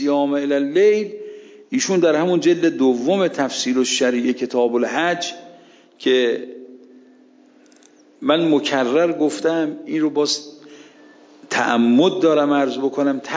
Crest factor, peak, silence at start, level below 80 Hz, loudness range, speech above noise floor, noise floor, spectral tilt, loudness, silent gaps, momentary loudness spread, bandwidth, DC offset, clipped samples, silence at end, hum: 16 dB; -2 dBFS; 0 s; -76 dBFS; 4 LU; 33 dB; -51 dBFS; -4 dB/octave; -18 LUFS; none; 9 LU; 8 kHz; under 0.1%; under 0.1%; 0 s; none